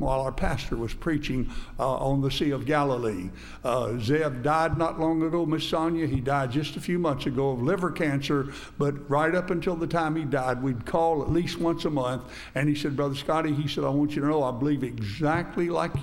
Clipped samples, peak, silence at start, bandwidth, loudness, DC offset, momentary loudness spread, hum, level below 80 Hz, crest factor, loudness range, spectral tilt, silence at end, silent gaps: under 0.1%; -10 dBFS; 0 s; 16 kHz; -27 LUFS; under 0.1%; 5 LU; none; -42 dBFS; 16 dB; 1 LU; -6.5 dB/octave; 0 s; none